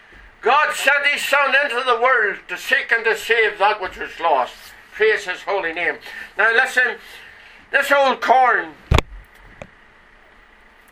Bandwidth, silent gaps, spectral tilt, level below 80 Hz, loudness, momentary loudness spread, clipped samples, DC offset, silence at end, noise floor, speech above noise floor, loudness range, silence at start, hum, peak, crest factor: 17 kHz; none; -3.5 dB/octave; -36 dBFS; -17 LUFS; 10 LU; under 0.1%; under 0.1%; 1.7 s; -49 dBFS; 31 dB; 3 LU; 0.45 s; none; 0 dBFS; 20 dB